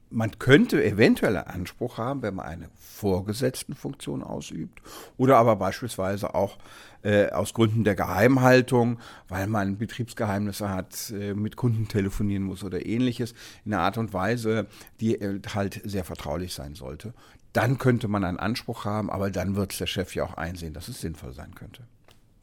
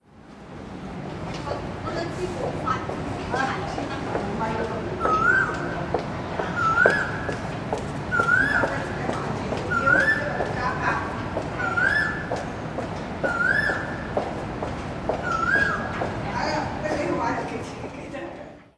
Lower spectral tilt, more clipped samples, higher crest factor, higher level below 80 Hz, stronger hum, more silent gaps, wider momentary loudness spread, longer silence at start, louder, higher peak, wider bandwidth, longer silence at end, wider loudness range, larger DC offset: about the same, -6 dB/octave vs -5.5 dB/octave; neither; about the same, 24 dB vs 26 dB; about the same, -48 dBFS vs -44 dBFS; neither; neither; first, 17 LU vs 13 LU; about the same, 0.1 s vs 0.15 s; about the same, -26 LUFS vs -25 LUFS; about the same, -2 dBFS vs 0 dBFS; first, 17.5 kHz vs 11 kHz; first, 0.55 s vs 0.15 s; first, 8 LU vs 5 LU; neither